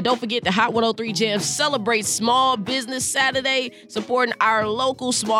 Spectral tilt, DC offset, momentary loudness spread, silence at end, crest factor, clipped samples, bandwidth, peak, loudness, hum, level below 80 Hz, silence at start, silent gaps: -2.5 dB/octave; under 0.1%; 5 LU; 0 s; 18 dB; under 0.1%; 17.5 kHz; -4 dBFS; -20 LUFS; none; -62 dBFS; 0 s; none